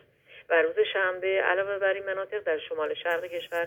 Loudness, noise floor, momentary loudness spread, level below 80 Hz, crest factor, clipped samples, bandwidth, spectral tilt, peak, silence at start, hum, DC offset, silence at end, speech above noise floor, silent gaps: -27 LUFS; -53 dBFS; 6 LU; -72 dBFS; 18 dB; under 0.1%; 18.5 kHz; -4 dB/octave; -10 dBFS; 0.3 s; none; under 0.1%; 0 s; 26 dB; none